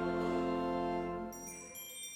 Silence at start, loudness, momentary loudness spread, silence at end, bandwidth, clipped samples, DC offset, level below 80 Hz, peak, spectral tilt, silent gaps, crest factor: 0 s; -38 LUFS; 11 LU; 0 s; 18 kHz; under 0.1%; under 0.1%; -58 dBFS; -24 dBFS; -5 dB/octave; none; 14 dB